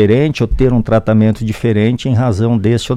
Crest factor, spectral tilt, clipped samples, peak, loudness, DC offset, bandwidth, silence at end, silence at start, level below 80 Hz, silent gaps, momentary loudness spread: 12 dB; -7.5 dB/octave; under 0.1%; 0 dBFS; -13 LUFS; under 0.1%; 11 kHz; 0 s; 0 s; -28 dBFS; none; 3 LU